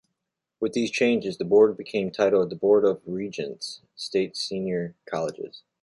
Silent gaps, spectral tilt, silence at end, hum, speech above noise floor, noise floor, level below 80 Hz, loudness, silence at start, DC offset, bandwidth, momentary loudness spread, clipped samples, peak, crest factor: none; -5 dB/octave; 0.25 s; none; 59 dB; -83 dBFS; -66 dBFS; -25 LUFS; 0.6 s; under 0.1%; 11.5 kHz; 13 LU; under 0.1%; -6 dBFS; 18 dB